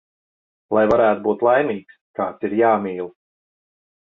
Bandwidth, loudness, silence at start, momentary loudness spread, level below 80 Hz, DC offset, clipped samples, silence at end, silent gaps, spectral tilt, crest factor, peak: 6.6 kHz; -19 LUFS; 0.7 s; 15 LU; -58 dBFS; under 0.1%; under 0.1%; 0.95 s; 2.01-2.14 s; -8.5 dB/octave; 18 dB; -4 dBFS